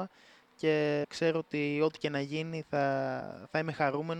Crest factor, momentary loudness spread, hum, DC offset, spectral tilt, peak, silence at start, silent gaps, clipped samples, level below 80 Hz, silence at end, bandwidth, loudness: 18 dB; 7 LU; none; under 0.1%; -6.5 dB/octave; -14 dBFS; 0 s; none; under 0.1%; -74 dBFS; 0 s; 9.8 kHz; -32 LUFS